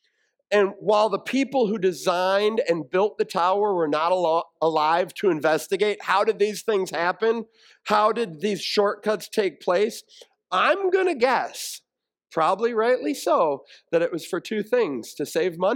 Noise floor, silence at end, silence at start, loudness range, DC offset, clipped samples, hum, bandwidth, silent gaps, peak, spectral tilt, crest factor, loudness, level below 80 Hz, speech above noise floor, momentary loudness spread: -70 dBFS; 0 s; 0.5 s; 2 LU; under 0.1%; under 0.1%; none; 17.5 kHz; none; -6 dBFS; -4 dB/octave; 16 dB; -23 LUFS; -78 dBFS; 48 dB; 7 LU